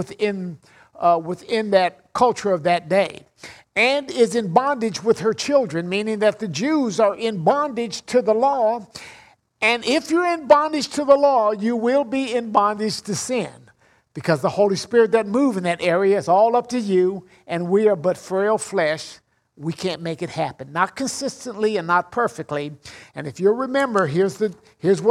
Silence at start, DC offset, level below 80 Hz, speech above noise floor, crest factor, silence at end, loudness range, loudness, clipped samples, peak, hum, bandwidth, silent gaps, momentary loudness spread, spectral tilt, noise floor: 0 s; under 0.1%; -64 dBFS; 36 dB; 18 dB; 0 s; 5 LU; -20 LUFS; under 0.1%; -2 dBFS; none; 14 kHz; none; 11 LU; -5 dB/octave; -56 dBFS